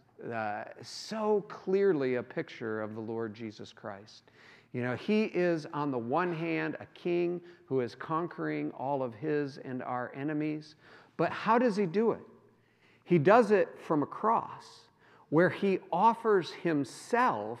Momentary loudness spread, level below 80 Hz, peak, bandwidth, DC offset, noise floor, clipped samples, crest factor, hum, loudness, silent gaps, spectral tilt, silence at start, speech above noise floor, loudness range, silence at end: 14 LU; -82 dBFS; -8 dBFS; 12 kHz; under 0.1%; -65 dBFS; under 0.1%; 22 dB; none; -31 LUFS; none; -7 dB/octave; 0.2 s; 34 dB; 6 LU; 0 s